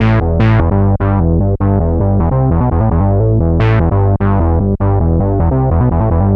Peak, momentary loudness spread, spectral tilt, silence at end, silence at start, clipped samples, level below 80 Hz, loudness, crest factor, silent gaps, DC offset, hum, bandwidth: 0 dBFS; 2 LU; -11 dB/octave; 0 s; 0 s; under 0.1%; -20 dBFS; -13 LUFS; 10 dB; none; under 0.1%; none; 4.7 kHz